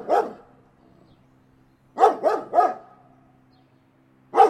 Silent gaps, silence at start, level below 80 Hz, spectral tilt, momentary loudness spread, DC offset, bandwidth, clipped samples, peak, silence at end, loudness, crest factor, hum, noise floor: none; 0 s; -70 dBFS; -4.5 dB/octave; 17 LU; under 0.1%; 12 kHz; under 0.1%; -2 dBFS; 0 s; -22 LUFS; 22 dB; none; -59 dBFS